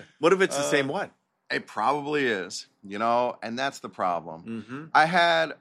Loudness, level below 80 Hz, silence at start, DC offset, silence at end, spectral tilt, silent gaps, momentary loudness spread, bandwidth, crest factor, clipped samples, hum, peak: -25 LUFS; -78 dBFS; 0 s; under 0.1%; 0.05 s; -4 dB/octave; none; 16 LU; 14 kHz; 20 dB; under 0.1%; none; -6 dBFS